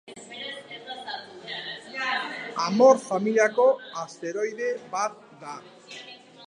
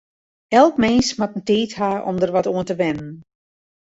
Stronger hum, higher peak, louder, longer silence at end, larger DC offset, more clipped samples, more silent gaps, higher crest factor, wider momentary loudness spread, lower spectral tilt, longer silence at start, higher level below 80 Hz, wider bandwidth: neither; second, -6 dBFS vs -2 dBFS; second, -25 LUFS vs -19 LUFS; second, 0 s vs 0.65 s; neither; neither; neither; about the same, 20 dB vs 18 dB; first, 22 LU vs 9 LU; about the same, -4 dB/octave vs -5 dB/octave; second, 0.05 s vs 0.5 s; second, -82 dBFS vs -50 dBFS; first, 10.5 kHz vs 8 kHz